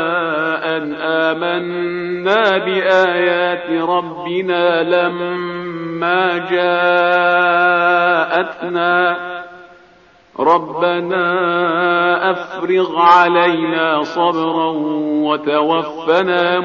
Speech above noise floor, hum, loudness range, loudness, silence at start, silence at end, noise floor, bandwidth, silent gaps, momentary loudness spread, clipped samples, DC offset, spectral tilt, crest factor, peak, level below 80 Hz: 33 dB; none; 3 LU; -15 LUFS; 0 s; 0 s; -48 dBFS; 7 kHz; none; 8 LU; under 0.1%; under 0.1%; -2.5 dB/octave; 16 dB; 0 dBFS; -64 dBFS